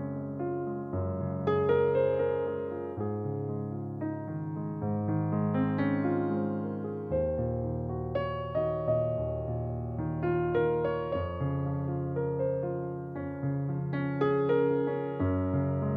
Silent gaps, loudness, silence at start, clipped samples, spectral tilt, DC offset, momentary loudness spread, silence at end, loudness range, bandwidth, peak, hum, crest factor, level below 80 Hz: none; -31 LUFS; 0 s; under 0.1%; -11 dB/octave; under 0.1%; 9 LU; 0 s; 2 LU; 4.9 kHz; -16 dBFS; none; 14 dB; -52 dBFS